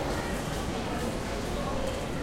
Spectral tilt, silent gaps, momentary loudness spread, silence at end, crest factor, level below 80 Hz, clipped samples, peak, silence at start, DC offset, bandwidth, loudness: -5 dB/octave; none; 1 LU; 0 s; 12 dB; -40 dBFS; under 0.1%; -20 dBFS; 0 s; under 0.1%; 16 kHz; -32 LUFS